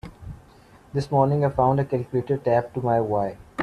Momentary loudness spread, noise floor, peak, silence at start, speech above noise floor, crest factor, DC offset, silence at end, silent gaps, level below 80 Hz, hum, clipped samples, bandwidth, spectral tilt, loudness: 11 LU; -51 dBFS; -6 dBFS; 0.05 s; 29 dB; 16 dB; under 0.1%; 0 s; none; -50 dBFS; none; under 0.1%; 10.5 kHz; -9 dB/octave; -23 LUFS